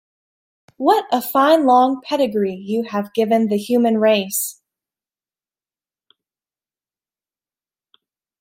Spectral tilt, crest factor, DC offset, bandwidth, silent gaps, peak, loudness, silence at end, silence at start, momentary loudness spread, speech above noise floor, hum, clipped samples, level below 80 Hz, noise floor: -4.5 dB/octave; 18 dB; under 0.1%; 16 kHz; none; -2 dBFS; -17 LUFS; 3.9 s; 0.8 s; 8 LU; over 73 dB; none; under 0.1%; -70 dBFS; under -90 dBFS